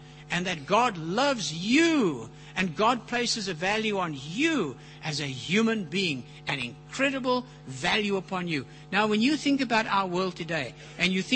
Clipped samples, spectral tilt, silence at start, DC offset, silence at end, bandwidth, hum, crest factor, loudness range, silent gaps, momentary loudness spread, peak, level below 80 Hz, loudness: under 0.1%; -4 dB/octave; 0 s; under 0.1%; 0 s; 8.8 kHz; none; 20 dB; 3 LU; none; 8 LU; -8 dBFS; -60 dBFS; -27 LUFS